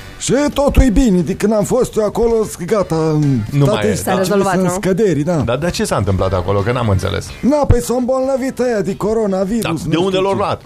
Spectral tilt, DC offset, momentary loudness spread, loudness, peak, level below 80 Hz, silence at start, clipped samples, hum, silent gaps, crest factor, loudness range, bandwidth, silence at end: -6 dB/octave; under 0.1%; 4 LU; -15 LUFS; 0 dBFS; -26 dBFS; 0 s; under 0.1%; none; none; 14 dB; 1 LU; 15.5 kHz; 0.05 s